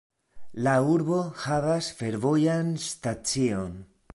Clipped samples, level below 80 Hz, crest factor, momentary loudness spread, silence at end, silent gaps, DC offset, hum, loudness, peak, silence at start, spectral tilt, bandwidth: under 0.1%; -56 dBFS; 16 dB; 9 LU; 0.3 s; none; under 0.1%; none; -26 LUFS; -10 dBFS; 0.35 s; -5.5 dB/octave; 11.5 kHz